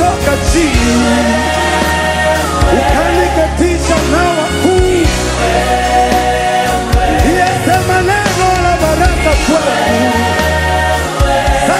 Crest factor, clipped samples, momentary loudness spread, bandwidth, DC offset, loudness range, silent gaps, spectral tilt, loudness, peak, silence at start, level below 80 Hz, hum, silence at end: 10 dB; under 0.1%; 2 LU; 16.5 kHz; under 0.1%; 0 LU; none; -4.5 dB/octave; -11 LUFS; 0 dBFS; 0 s; -18 dBFS; none; 0 s